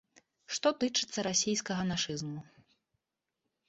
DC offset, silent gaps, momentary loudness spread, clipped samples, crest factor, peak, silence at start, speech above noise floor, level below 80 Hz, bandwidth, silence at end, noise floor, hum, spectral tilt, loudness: under 0.1%; none; 10 LU; under 0.1%; 20 dB; -14 dBFS; 0.5 s; 55 dB; -68 dBFS; 8.2 kHz; 1.25 s; -87 dBFS; none; -3 dB/octave; -32 LUFS